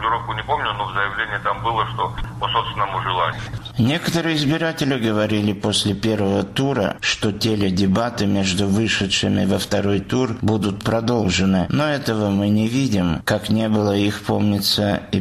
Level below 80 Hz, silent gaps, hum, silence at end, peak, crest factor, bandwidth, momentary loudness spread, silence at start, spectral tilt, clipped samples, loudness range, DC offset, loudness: -42 dBFS; none; none; 0 s; -6 dBFS; 14 dB; 15 kHz; 4 LU; 0 s; -5 dB/octave; under 0.1%; 3 LU; under 0.1%; -20 LUFS